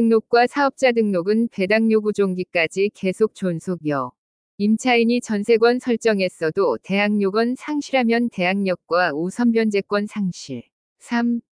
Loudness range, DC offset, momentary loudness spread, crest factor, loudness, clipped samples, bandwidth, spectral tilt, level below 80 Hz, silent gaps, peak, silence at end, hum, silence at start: 2 LU; under 0.1%; 9 LU; 16 dB; -20 LUFS; under 0.1%; 10.5 kHz; -6 dB/octave; -68 dBFS; 4.18-4.58 s, 10.73-10.96 s; -4 dBFS; 0.15 s; none; 0 s